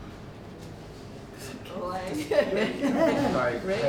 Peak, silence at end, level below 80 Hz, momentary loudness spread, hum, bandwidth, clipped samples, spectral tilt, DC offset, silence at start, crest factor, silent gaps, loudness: -10 dBFS; 0 s; -52 dBFS; 19 LU; none; 19 kHz; under 0.1%; -5.5 dB/octave; under 0.1%; 0 s; 18 dB; none; -27 LUFS